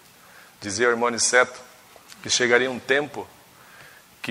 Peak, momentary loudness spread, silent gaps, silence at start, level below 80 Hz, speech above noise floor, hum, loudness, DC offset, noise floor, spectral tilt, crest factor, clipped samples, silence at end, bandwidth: -4 dBFS; 19 LU; none; 0.6 s; -68 dBFS; 28 dB; none; -21 LUFS; under 0.1%; -50 dBFS; -1.5 dB/octave; 22 dB; under 0.1%; 0 s; 16 kHz